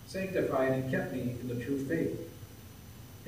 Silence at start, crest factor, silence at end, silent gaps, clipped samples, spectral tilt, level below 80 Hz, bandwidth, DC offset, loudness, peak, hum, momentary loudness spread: 0 s; 16 dB; 0 s; none; under 0.1%; -7 dB/octave; -60 dBFS; 15.5 kHz; under 0.1%; -33 LUFS; -18 dBFS; none; 20 LU